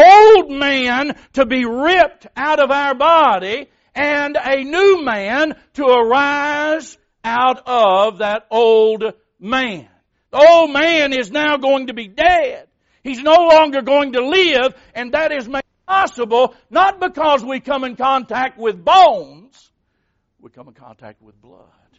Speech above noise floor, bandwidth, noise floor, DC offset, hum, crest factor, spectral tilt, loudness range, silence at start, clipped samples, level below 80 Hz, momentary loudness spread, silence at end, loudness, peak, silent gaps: 53 dB; 8 kHz; -67 dBFS; under 0.1%; none; 14 dB; -0.5 dB/octave; 3 LU; 0 s; under 0.1%; -50 dBFS; 13 LU; 0.9 s; -14 LUFS; 0 dBFS; none